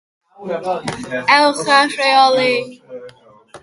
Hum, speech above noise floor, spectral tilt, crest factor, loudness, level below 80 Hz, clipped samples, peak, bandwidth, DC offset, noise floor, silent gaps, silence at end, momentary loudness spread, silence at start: none; 28 dB; -3 dB/octave; 16 dB; -14 LUFS; -60 dBFS; under 0.1%; 0 dBFS; 11.5 kHz; under 0.1%; -43 dBFS; none; 0.05 s; 22 LU; 0.4 s